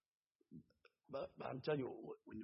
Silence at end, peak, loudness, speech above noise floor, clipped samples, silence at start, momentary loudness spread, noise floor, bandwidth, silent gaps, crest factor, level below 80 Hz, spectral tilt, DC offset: 0 s; -28 dBFS; -47 LUFS; 40 dB; under 0.1%; 0.5 s; 20 LU; -87 dBFS; 5.6 kHz; none; 20 dB; -78 dBFS; -5.5 dB/octave; under 0.1%